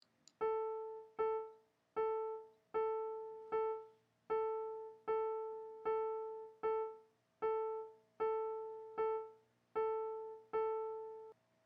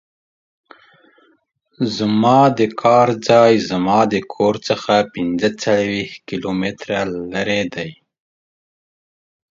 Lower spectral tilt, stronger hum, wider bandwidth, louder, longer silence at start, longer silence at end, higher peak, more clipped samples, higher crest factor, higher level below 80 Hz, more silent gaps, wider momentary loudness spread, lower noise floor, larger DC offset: second, -3 dB/octave vs -5.5 dB/octave; neither; about the same, 7.2 kHz vs 7.8 kHz; second, -42 LUFS vs -17 LUFS; second, 0.4 s vs 1.8 s; second, 0.35 s vs 1.65 s; second, -28 dBFS vs 0 dBFS; neither; about the same, 14 dB vs 18 dB; second, -82 dBFS vs -54 dBFS; neither; about the same, 10 LU vs 11 LU; about the same, -63 dBFS vs -60 dBFS; neither